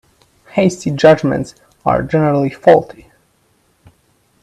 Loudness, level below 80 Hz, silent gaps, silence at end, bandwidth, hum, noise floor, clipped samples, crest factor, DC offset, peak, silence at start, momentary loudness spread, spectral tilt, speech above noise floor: -14 LUFS; -46 dBFS; none; 1.55 s; 12 kHz; none; -58 dBFS; under 0.1%; 16 dB; under 0.1%; 0 dBFS; 0.55 s; 11 LU; -6.5 dB/octave; 45 dB